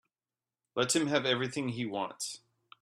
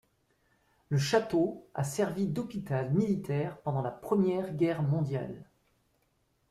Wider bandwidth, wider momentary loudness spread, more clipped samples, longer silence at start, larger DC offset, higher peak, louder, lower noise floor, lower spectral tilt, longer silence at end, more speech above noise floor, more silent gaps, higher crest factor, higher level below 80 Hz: about the same, 14.5 kHz vs 14 kHz; first, 12 LU vs 7 LU; neither; second, 0.75 s vs 0.9 s; neither; about the same, -12 dBFS vs -14 dBFS; about the same, -32 LUFS vs -31 LUFS; first, under -90 dBFS vs -73 dBFS; second, -3.5 dB/octave vs -7 dB/octave; second, 0.45 s vs 1.1 s; first, over 58 dB vs 43 dB; neither; about the same, 22 dB vs 18 dB; second, -74 dBFS vs -64 dBFS